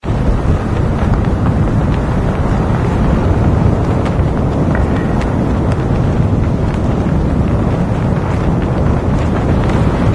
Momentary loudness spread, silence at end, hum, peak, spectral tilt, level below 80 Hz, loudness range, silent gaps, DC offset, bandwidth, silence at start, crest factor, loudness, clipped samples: 2 LU; 0 s; none; 0 dBFS; -8.5 dB/octave; -20 dBFS; 1 LU; none; under 0.1%; 11 kHz; 0 s; 12 dB; -14 LUFS; under 0.1%